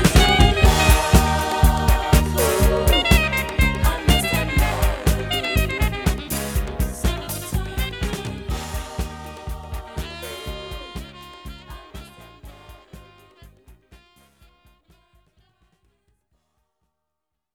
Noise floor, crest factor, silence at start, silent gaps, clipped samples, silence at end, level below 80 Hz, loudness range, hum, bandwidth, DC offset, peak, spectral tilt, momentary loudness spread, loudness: -82 dBFS; 20 dB; 0 s; none; under 0.1%; 3.6 s; -24 dBFS; 19 LU; none; 20 kHz; under 0.1%; 0 dBFS; -4.5 dB/octave; 20 LU; -20 LUFS